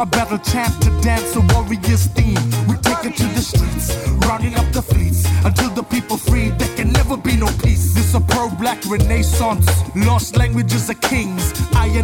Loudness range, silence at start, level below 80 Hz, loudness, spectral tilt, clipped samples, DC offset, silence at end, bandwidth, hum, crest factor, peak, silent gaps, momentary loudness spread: 1 LU; 0 s; -22 dBFS; -17 LUFS; -5 dB/octave; under 0.1%; under 0.1%; 0 s; 17.5 kHz; none; 12 dB; -4 dBFS; none; 4 LU